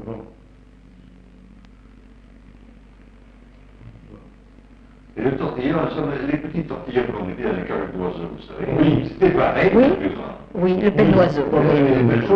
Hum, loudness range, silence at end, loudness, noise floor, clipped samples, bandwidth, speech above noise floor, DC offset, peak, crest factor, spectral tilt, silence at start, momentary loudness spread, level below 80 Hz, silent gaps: none; 11 LU; 0 s; -19 LUFS; -47 dBFS; under 0.1%; 6.4 kHz; 28 dB; under 0.1%; -4 dBFS; 16 dB; -9.5 dB/octave; 0 s; 14 LU; -42 dBFS; none